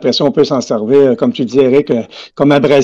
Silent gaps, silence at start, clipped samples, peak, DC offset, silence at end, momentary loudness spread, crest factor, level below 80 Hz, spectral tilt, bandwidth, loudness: none; 0 s; under 0.1%; 0 dBFS; 0.2%; 0 s; 7 LU; 10 dB; -50 dBFS; -6 dB/octave; 7.6 kHz; -12 LUFS